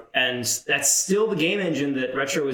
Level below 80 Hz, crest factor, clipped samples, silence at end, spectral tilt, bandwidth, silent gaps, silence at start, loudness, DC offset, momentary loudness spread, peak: -66 dBFS; 16 dB; under 0.1%; 0 s; -2.5 dB/octave; 19.5 kHz; none; 0 s; -22 LUFS; under 0.1%; 6 LU; -8 dBFS